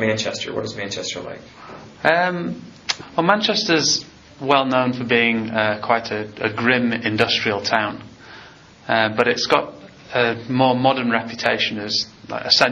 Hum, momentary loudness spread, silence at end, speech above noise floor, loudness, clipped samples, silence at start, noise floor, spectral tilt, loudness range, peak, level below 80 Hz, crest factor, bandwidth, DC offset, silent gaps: none; 13 LU; 0 s; 24 dB; -19 LUFS; under 0.1%; 0 s; -44 dBFS; -2 dB/octave; 3 LU; 0 dBFS; -58 dBFS; 20 dB; 7.6 kHz; under 0.1%; none